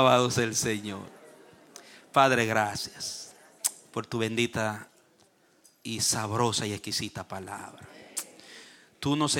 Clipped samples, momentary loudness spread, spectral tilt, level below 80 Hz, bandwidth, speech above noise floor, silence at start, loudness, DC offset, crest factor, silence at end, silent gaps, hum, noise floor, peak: under 0.1%; 24 LU; -3.5 dB/octave; -64 dBFS; 17.5 kHz; 36 dB; 0 s; -28 LUFS; under 0.1%; 26 dB; 0 s; none; none; -63 dBFS; -4 dBFS